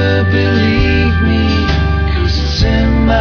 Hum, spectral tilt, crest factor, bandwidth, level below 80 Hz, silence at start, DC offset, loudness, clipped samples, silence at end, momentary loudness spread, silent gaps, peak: none; -7 dB/octave; 10 dB; 5.4 kHz; -16 dBFS; 0 s; under 0.1%; -12 LUFS; under 0.1%; 0 s; 3 LU; none; 0 dBFS